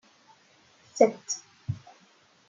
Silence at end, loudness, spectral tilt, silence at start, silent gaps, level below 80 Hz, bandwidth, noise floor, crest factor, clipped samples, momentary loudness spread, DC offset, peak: 0.7 s; -28 LUFS; -4.5 dB/octave; 0.95 s; none; -70 dBFS; 9.4 kHz; -61 dBFS; 26 dB; under 0.1%; 16 LU; under 0.1%; -6 dBFS